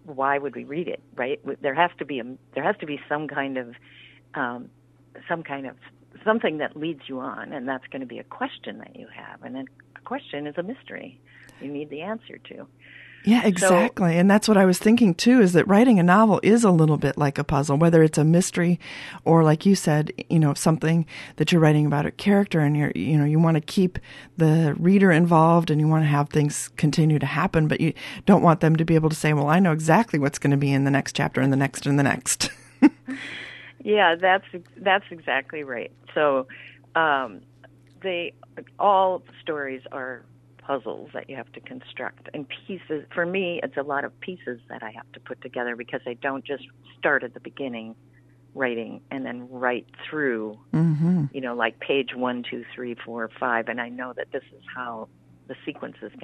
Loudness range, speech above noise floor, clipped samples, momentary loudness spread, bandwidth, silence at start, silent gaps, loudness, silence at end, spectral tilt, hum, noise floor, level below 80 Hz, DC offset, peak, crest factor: 14 LU; 30 dB; under 0.1%; 19 LU; 13 kHz; 0.05 s; none; -22 LUFS; 0.05 s; -6 dB/octave; none; -52 dBFS; -56 dBFS; under 0.1%; -4 dBFS; 20 dB